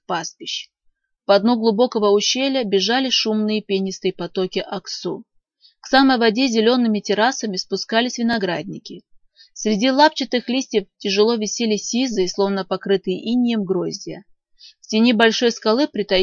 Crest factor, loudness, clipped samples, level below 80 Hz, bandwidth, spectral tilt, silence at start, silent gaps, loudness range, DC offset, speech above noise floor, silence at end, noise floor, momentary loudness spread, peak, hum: 20 dB; -19 LUFS; under 0.1%; -58 dBFS; 7.4 kHz; -4 dB/octave; 0.1 s; none; 3 LU; under 0.1%; 46 dB; 0 s; -65 dBFS; 12 LU; 0 dBFS; none